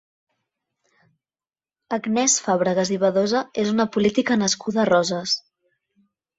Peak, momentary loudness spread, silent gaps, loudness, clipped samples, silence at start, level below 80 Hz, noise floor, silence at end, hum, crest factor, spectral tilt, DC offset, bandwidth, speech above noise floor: -6 dBFS; 6 LU; none; -21 LUFS; under 0.1%; 1.9 s; -64 dBFS; under -90 dBFS; 1 s; none; 18 dB; -3.5 dB/octave; under 0.1%; 8 kHz; over 69 dB